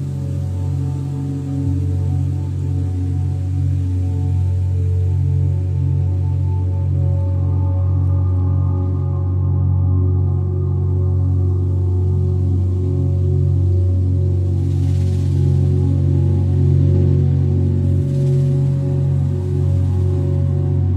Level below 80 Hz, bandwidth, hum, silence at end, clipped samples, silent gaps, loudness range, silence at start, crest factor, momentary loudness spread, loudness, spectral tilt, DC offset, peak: -36 dBFS; 2.6 kHz; none; 0 s; under 0.1%; none; 4 LU; 0 s; 12 dB; 5 LU; -18 LUFS; -10.5 dB/octave; under 0.1%; -4 dBFS